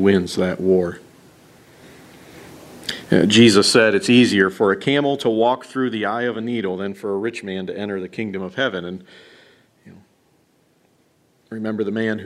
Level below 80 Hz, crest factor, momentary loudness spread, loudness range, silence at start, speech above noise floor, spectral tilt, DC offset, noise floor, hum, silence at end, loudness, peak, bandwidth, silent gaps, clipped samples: -60 dBFS; 20 dB; 16 LU; 15 LU; 0 s; 42 dB; -4.5 dB/octave; under 0.1%; -60 dBFS; none; 0 s; -19 LUFS; 0 dBFS; 14 kHz; none; under 0.1%